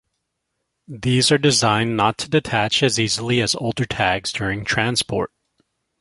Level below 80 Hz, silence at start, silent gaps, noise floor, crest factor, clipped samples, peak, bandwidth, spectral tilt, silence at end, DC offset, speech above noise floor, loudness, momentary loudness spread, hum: -48 dBFS; 0.9 s; none; -76 dBFS; 18 dB; under 0.1%; -2 dBFS; 11.5 kHz; -4 dB/octave; 0.75 s; under 0.1%; 57 dB; -19 LUFS; 8 LU; none